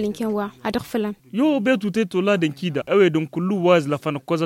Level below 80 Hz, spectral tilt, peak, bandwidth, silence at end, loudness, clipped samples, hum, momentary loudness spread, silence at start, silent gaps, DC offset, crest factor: -58 dBFS; -6.5 dB/octave; -4 dBFS; 16.5 kHz; 0 s; -21 LUFS; under 0.1%; none; 9 LU; 0 s; none; under 0.1%; 16 dB